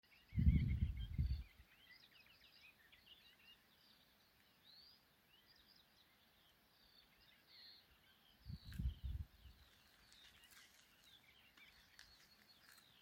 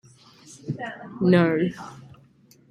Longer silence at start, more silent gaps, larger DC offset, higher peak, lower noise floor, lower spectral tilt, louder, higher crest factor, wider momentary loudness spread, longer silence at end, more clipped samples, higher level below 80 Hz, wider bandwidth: second, 0.3 s vs 0.5 s; neither; neither; second, -22 dBFS vs -6 dBFS; first, -74 dBFS vs -56 dBFS; about the same, -7 dB/octave vs -7.5 dB/octave; second, -44 LUFS vs -23 LUFS; first, 28 dB vs 20 dB; first, 25 LU vs 21 LU; first, 1.35 s vs 0.7 s; neither; first, -52 dBFS vs -64 dBFS; first, 16.5 kHz vs 10 kHz